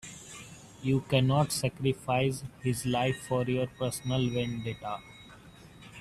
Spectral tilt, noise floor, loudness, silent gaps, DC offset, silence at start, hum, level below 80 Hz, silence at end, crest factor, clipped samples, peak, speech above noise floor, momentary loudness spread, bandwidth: -5.5 dB/octave; -52 dBFS; -30 LUFS; none; under 0.1%; 0.05 s; none; -56 dBFS; 0 s; 20 dB; under 0.1%; -12 dBFS; 22 dB; 21 LU; 14 kHz